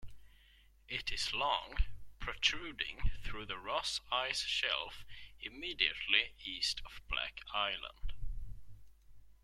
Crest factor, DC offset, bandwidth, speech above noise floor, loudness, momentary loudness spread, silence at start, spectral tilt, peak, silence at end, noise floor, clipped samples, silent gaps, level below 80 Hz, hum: 26 dB; under 0.1%; 13 kHz; 27 dB; -36 LUFS; 15 LU; 0 s; -1.5 dB/octave; -12 dBFS; 0.1 s; -64 dBFS; under 0.1%; none; -46 dBFS; none